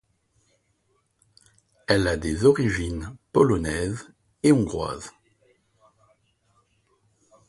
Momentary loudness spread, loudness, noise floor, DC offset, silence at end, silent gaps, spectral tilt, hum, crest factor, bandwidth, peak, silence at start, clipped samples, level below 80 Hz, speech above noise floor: 16 LU; -23 LUFS; -70 dBFS; under 0.1%; 2.4 s; none; -6 dB/octave; none; 22 dB; 11.5 kHz; -4 dBFS; 1.9 s; under 0.1%; -44 dBFS; 48 dB